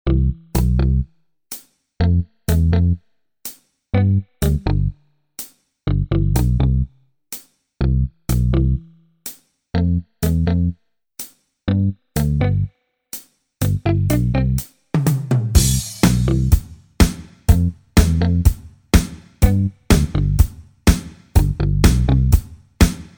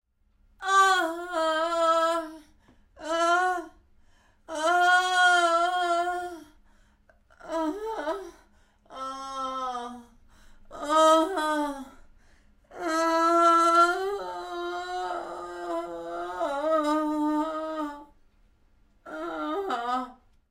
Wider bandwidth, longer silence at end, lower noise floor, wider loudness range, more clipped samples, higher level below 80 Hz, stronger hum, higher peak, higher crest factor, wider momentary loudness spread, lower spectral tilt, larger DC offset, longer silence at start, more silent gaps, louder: first, over 20 kHz vs 16 kHz; second, 0.15 s vs 0.4 s; second, -46 dBFS vs -64 dBFS; second, 5 LU vs 10 LU; neither; first, -22 dBFS vs -60 dBFS; neither; first, 0 dBFS vs -10 dBFS; about the same, 18 dB vs 18 dB; about the same, 17 LU vs 17 LU; first, -6 dB/octave vs -1.5 dB/octave; neither; second, 0.05 s vs 0.6 s; neither; first, -19 LUFS vs -26 LUFS